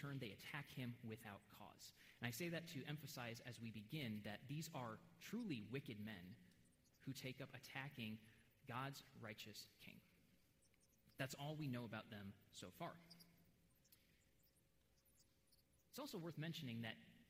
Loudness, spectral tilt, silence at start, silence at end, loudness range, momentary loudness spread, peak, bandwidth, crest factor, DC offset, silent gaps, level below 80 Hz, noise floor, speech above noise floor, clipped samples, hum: -53 LUFS; -5 dB/octave; 0 s; 0 s; 8 LU; 11 LU; -34 dBFS; 16 kHz; 22 dB; under 0.1%; none; -84 dBFS; -80 dBFS; 27 dB; under 0.1%; none